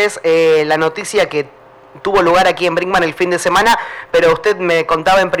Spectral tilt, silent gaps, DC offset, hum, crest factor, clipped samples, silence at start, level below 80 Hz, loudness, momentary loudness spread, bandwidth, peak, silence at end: -4 dB/octave; none; under 0.1%; none; 8 dB; under 0.1%; 0 s; -42 dBFS; -13 LUFS; 6 LU; 17.5 kHz; -6 dBFS; 0 s